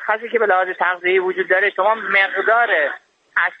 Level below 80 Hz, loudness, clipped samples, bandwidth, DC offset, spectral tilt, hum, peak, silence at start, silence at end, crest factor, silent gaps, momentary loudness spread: -74 dBFS; -17 LUFS; under 0.1%; 5.4 kHz; under 0.1%; -5 dB/octave; none; -4 dBFS; 0 s; 0.05 s; 14 dB; none; 5 LU